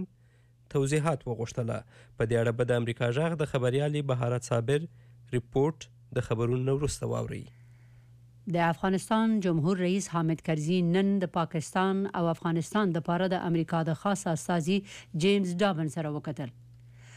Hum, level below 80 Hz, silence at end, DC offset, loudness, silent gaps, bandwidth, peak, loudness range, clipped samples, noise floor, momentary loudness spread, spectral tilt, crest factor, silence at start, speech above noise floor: none; -56 dBFS; 0 s; under 0.1%; -29 LUFS; none; 14 kHz; -16 dBFS; 4 LU; under 0.1%; -60 dBFS; 8 LU; -6.5 dB/octave; 14 dB; 0 s; 32 dB